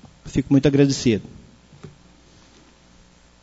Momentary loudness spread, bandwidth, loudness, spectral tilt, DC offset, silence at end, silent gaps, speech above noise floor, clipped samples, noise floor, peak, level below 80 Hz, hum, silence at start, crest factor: 10 LU; 8 kHz; -19 LUFS; -6 dB/octave; under 0.1%; 1.55 s; none; 34 dB; under 0.1%; -52 dBFS; -4 dBFS; -46 dBFS; none; 0.25 s; 20 dB